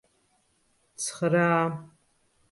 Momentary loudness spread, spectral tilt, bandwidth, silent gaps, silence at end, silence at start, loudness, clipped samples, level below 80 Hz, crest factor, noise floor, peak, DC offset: 11 LU; -5 dB/octave; 11.5 kHz; none; 0.65 s; 1 s; -26 LUFS; under 0.1%; -72 dBFS; 18 dB; -69 dBFS; -12 dBFS; under 0.1%